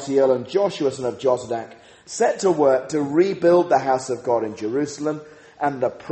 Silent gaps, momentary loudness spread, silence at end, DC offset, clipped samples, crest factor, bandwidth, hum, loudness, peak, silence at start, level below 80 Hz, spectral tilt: none; 10 LU; 0 s; under 0.1%; under 0.1%; 16 dB; 8.8 kHz; none; -21 LUFS; -6 dBFS; 0 s; -64 dBFS; -5.5 dB/octave